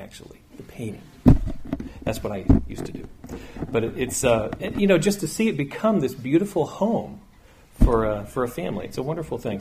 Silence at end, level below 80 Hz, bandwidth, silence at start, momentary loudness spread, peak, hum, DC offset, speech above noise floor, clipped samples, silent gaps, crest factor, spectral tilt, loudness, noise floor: 0 s; -32 dBFS; 15.5 kHz; 0 s; 16 LU; -2 dBFS; none; under 0.1%; 27 dB; under 0.1%; none; 20 dB; -6 dB/octave; -24 LUFS; -51 dBFS